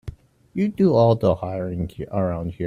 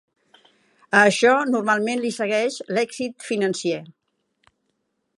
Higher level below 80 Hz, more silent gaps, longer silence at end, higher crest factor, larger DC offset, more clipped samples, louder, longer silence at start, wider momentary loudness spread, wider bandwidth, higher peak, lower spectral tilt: first, -46 dBFS vs -74 dBFS; neither; second, 0 s vs 1.3 s; second, 16 dB vs 22 dB; neither; neither; about the same, -21 LUFS vs -21 LUFS; second, 0.05 s vs 0.9 s; about the same, 12 LU vs 11 LU; second, 7 kHz vs 11.5 kHz; second, -6 dBFS vs -2 dBFS; first, -9.5 dB/octave vs -4 dB/octave